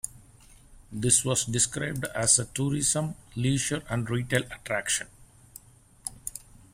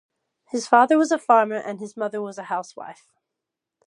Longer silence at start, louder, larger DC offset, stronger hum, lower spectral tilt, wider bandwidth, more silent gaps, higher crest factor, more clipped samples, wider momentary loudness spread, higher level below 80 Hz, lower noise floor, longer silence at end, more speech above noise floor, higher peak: second, 0.05 s vs 0.55 s; second, -26 LUFS vs -21 LUFS; neither; neither; second, -3 dB/octave vs -4.5 dB/octave; first, 16 kHz vs 11 kHz; neither; about the same, 22 dB vs 22 dB; neither; about the same, 17 LU vs 18 LU; first, -52 dBFS vs -80 dBFS; second, -54 dBFS vs -85 dBFS; second, 0.35 s vs 0.95 s; second, 26 dB vs 64 dB; second, -6 dBFS vs -2 dBFS